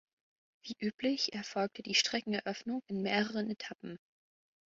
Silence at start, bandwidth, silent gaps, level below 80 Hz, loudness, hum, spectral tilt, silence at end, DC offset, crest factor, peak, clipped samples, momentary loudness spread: 0.65 s; 7.6 kHz; 0.94-0.98 s; -78 dBFS; -35 LUFS; none; -2 dB/octave; 0.7 s; under 0.1%; 24 dB; -14 dBFS; under 0.1%; 17 LU